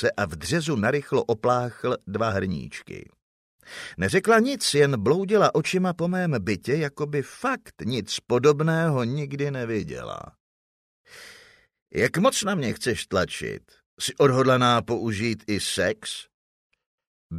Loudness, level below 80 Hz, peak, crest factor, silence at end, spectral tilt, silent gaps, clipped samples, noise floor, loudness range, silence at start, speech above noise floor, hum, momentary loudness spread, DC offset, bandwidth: -24 LUFS; -56 dBFS; -6 dBFS; 18 dB; 0 s; -5 dB/octave; 3.22-3.59 s, 10.40-11.04 s, 11.82-11.86 s, 13.86-13.97 s, 16.34-16.70 s, 16.86-16.98 s, 17.07-17.30 s; under 0.1%; -54 dBFS; 5 LU; 0 s; 30 dB; none; 14 LU; under 0.1%; 15.5 kHz